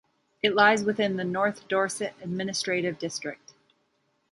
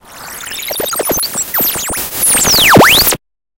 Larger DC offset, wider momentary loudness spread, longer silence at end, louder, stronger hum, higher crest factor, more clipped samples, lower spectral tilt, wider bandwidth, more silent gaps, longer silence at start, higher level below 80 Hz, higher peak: neither; second, 12 LU vs 16 LU; first, 0.95 s vs 0.45 s; second, -26 LUFS vs -9 LUFS; neither; first, 22 dB vs 12 dB; second, under 0.1% vs 0.3%; first, -4 dB/octave vs -2 dB/octave; second, 11.5 kHz vs over 20 kHz; neither; first, 0.45 s vs 0.1 s; second, -70 dBFS vs -34 dBFS; second, -6 dBFS vs 0 dBFS